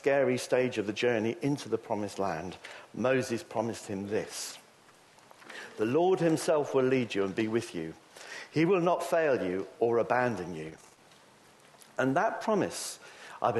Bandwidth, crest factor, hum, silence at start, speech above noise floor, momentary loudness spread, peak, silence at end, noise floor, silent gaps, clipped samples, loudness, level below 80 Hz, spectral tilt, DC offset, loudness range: 12.5 kHz; 18 dB; none; 0.05 s; 29 dB; 16 LU; -12 dBFS; 0 s; -59 dBFS; none; under 0.1%; -30 LUFS; -72 dBFS; -5.5 dB/octave; under 0.1%; 5 LU